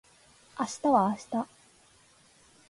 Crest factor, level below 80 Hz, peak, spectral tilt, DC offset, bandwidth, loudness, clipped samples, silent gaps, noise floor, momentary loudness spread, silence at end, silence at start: 20 dB; -70 dBFS; -12 dBFS; -5.5 dB/octave; under 0.1%; 11.5 kHz; -29 LUFS; under 0.1%; none; -61 dBFS; 16 LU; 1.25 s; 0.55 s